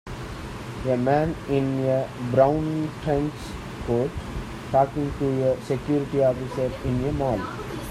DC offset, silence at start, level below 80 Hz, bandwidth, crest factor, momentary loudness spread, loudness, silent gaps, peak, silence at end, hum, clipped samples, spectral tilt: under 0.1%; 0.05 s; -42 dBFS; 14.5 kHz; 18 dB; 13 LU; -25 LUFS; none; -6 dBFS; 0 s; none; under 0.1%; -7.5 dB/octave